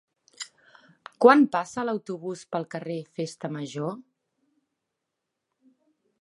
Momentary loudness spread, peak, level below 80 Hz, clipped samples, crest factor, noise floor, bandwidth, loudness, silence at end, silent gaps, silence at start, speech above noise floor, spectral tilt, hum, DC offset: 23 LU; -2 dBFS; -78 dBFS; under 0.1%; 26 dB; -83 dBFS; 11.5 kHz; -25 LUFS; 2.2 s; none; 0.4 s; 59 dB; -5.5 dB/octave; none; under 0.1%